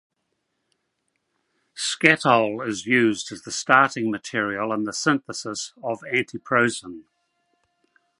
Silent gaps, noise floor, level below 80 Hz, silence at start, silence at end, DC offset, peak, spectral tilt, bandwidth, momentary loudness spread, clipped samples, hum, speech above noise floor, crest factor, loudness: none; -76 dBFS; -68 dBFS; 1.75 s; 1.2 s; under 0.1%; 0 dBFS; -3.5 dB/octave; 11.5 kHz; 13 LU; under 0.1%; none; 53 dB; 24 dB; -22 LUFS